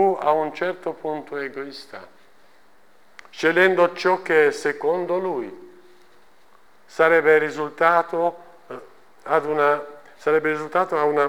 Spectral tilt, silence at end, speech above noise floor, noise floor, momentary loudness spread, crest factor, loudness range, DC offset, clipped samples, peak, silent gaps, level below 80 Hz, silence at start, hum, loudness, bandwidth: -5 dB/octave; 0 s; 37 dB; -58 dBFS; 22 LU; 18 dB; 4 LU; 0.3%; under 0.1%; -4 dBFS; none; -70 dBFS; 0 s; none; -21 LUFS; 15.5 kHz